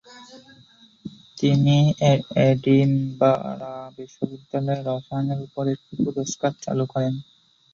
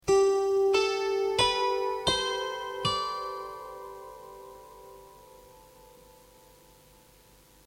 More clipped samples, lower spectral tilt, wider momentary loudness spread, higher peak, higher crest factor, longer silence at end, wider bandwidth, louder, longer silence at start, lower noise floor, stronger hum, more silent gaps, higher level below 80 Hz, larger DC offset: neither; first, -7 dB/octave vs -3 dB/octave; second, 17 LU vs 23 LU; first, -6 dBFS vs -12 dBFS; about the same, 18 dB vs 18 dB; second, 0.5 s vs 2.3 s; second, 7.4 kHz vs 16.5 kHz; first, -22 LUFS vs -27 LUFS; about the same, 0.1 s vs 0.05 s; second, -53 dBFS vs -58 dBFS; neither; neither; about the same, -58 dBFS vs -56 dBFS; neither